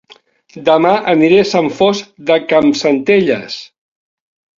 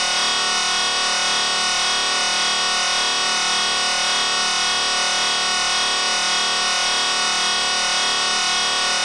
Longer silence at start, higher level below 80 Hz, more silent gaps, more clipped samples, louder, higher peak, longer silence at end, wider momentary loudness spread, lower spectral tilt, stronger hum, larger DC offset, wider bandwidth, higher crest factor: first, 0.55 s vs 0 s; about the same, -54 dBFS vs -54 dBFS; neither; neither; first, -12 LUFS vs -17 LUFS; first, 0 dBFS vs -8 dBFS; first, 0.95 s vs 0 s; first, 10 LU vs 0 LU; first, -5.5 dB/octave vs 1.5 dB/octave; neither; neither; second, 7.6 kHz vs 11.5 kHz; about the same, 14 dB vs 12 dB